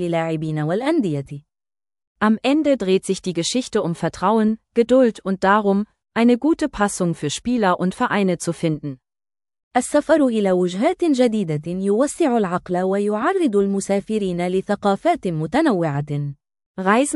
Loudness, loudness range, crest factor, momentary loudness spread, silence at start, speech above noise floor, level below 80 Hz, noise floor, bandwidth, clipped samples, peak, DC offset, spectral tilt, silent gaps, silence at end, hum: -20 LUFS; 3 LU; 18 dB; 7 LU; 0 s; over 71 dB; -54 dBFS; under -90 dBFS; 12 kHz; under 0.1%; -2 dBFS; under 0.1%; -5.5 dB/octave; 2.07-2.15 s, 9.63-9.71 s, 16.66-16.74 s; 0 s; none